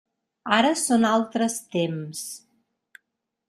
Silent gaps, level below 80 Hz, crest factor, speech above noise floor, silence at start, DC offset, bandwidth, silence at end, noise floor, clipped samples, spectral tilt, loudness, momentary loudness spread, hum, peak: none; -70 dBFS; 22 dB; 57 dB; 0.45 s; under 0.1%; 15.5 kHz; 1.1 s; -80 dBFS; under 0.1%; -3.5 dB/octave; -23 LUFS; 16 LU; none; -4 dBFS